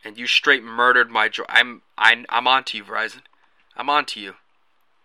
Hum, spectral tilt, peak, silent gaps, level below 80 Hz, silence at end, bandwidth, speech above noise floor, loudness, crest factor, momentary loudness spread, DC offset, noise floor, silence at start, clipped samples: none; -1 dB/octave; 0 dBFS; none; -76 dBFS; 0.7 s; 15 kHz; 47 dB; -18 LUFS; 22 dB; 13 LU; under 0.1%; -67 dBFS; 0.05 s; under 0.1%